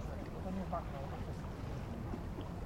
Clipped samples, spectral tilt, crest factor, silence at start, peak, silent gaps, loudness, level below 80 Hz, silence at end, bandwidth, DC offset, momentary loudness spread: under 0.1%; -7.5 dB/octave; 14 dB; 0 s; -28 dBFS; none; -43 LUFS; -48 dBFS; 0 s; 16.5 kHz; under 0.1%; 4 LU